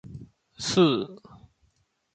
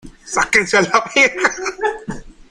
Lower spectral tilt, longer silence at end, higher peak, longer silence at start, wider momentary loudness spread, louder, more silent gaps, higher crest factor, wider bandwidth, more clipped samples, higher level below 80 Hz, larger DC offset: first, -5 dB/octave vs -2.5 dB/octave; first, 1 s vs 0.2 s; second, -8 dBFS vs 0 dBFS; about the same, 0.05 s vs 0.05 s; first, 24 LU vs 16 LU; second, -24 LUFS vs -15 LUFS; neither; about the same, 20 dB vs 18 dB; second, 9.2 kHz vs 15 kHz; neither; second, -60 dBFS vs -44 dBFS; neither